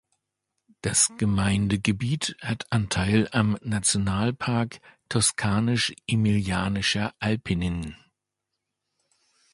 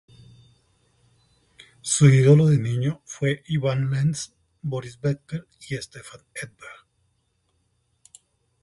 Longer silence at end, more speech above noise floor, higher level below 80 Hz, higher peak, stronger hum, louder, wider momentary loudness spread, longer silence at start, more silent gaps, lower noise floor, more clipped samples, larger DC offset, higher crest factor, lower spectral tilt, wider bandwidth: second, 1.6 s vs 1.9 s; first, 59 dB vs 48 dB; first, -46 dBFS vs -58 dBFS; about the same, -4 dBFS vs -4 dBFS; neither; second, -25 LUFS vs -22 LUFS; second, 7 LU vs 23 LU; second, 0.85 s vs 1.85 s; neither; first, -83 dBFS vs -70 dBFS; neither; neither; about the same, 22 dB vs 20 dB; second, -4 dB/octave vs -6 dB/octave; about the same, 11.5 kHz vs 11.5 kHz